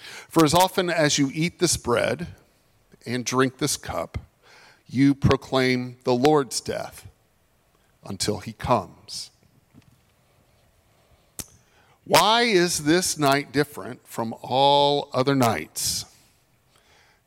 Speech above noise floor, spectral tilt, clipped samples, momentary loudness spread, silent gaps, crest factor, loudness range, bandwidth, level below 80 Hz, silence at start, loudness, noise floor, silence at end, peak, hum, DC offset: 42 dB; -4 dB/octave; under 0.1%; 19 LU; none; 20 dB; 9 LU; 16.5 kHz; -52 dBFS; 0 s; -22 LUFS; -64 dBFS; 1.25 s; -4 dBFS; none; under 0.1%